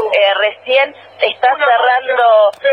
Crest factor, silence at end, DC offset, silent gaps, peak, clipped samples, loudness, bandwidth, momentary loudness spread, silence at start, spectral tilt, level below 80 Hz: 12 dB; 0 s; under 0.1%; none; 0 dBFS; under 0.1%; -12 LUFS; 5.6 kHz; 7 LU; 0 s; -2 dB/octave; -70 dBFS